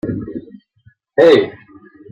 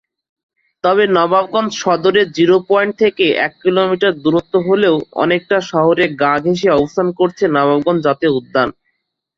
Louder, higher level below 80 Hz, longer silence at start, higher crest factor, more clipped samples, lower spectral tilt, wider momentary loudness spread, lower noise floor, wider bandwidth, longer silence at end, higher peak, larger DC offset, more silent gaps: about the same, -14 LUFS vs -14 LUFS; about the same, -52 dBFS vs -54 dBFS; second, 0.05 s vs 0.85 s; about the same, 16 dB vs 14 dB; neither; about the same, -6.5 dB/octave vs -5.5 dB/octave; first, 19 LU vs 4 LU; second, -53 dBFS vs -69 dBFS; about the same, 8 kHz vs 7.4 kHz; about the same, 0.6 s vs 0.65 s; about the same, -2 dBFS vs 0 dBFS; neither; neither